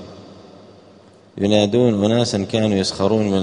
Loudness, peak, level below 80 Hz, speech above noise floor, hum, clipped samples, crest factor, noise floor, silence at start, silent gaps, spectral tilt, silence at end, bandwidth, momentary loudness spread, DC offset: -18 LUFS; 0 dBFS; -54 dBFS; 30 dB; none; under 0.1%; 18 dB; -47 dBFS; 0 s; none; -6 dB/octave; 0 s; 10.5 kHz; 4 LU; under 0.1%